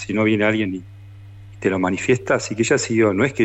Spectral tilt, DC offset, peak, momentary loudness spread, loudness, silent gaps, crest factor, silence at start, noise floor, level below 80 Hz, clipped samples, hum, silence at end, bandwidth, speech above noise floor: -5 dB/octave; under 0.1%; -6 dBFS; 7 LU; -19 LUFS; none; 14 dB; 0 s; -40 dBFS; -52 dBFS; under 0.1%; none; 0 s; 8.4 kHz; 21 dB